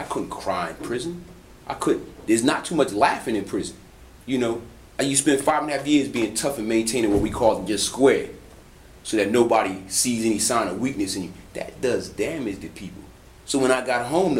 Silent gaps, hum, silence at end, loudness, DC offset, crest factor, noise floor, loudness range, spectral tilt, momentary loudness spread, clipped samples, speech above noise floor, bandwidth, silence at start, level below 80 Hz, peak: none; none; 0 s; -23 LUFS; under 0.1%; 20 dB; -47 dBFS; 4 LU; -3.5 dB/octave; 16 LU; under 0.1%; 24 dB; 16 kHz; 0 s; -48 dBFS; -4 dBFS